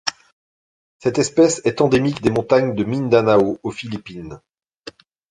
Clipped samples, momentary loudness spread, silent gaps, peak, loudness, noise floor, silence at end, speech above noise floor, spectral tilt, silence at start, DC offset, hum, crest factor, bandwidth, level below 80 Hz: under 0.1%; 15 LU; 0.32-1.00 s; 0 dBFS; -18 LUFS; -42 dBFS; 0.4 s; 24 dB; -5.5 dB/octave; 0.05 s; under 0.1%; none; 18 dB; 11 kHz; -52 dBFS